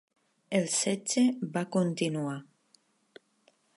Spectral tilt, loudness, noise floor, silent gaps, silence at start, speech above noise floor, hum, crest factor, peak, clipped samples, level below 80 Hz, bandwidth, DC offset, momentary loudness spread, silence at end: -4.5 dB/octave; -29 LUFS; -69 dBFS; none; 0.5 s; 39 dB; none; 18 dB; -14 dBFS; under 0.1%; -82 dBFS; 11.5 kHz; under 0.1%; 8 LU; 1.35 s